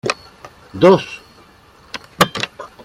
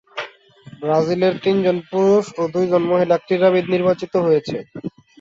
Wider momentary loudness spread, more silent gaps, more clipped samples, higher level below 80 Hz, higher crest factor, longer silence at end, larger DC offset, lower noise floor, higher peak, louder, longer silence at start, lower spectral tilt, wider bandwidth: first, 21 LU vs 15 LU; neither; neither; first, -52 dBFS vs -60 dBFS; about the same, 18 dB vs 16 dB; about the same, 0.2 s vs 0.3 s; neither; about the same, -47 dBFS vs -44 dBFS; about the same, 0 dBFS vs -2 dBFS; about the same, -16 LUFS vs -18 LUFS; about the same, 0.05 s vs 0.15 s; second, -5 dB/octave vs -7 dB/octave; first, 16.5 kHz vs 7.8 kHz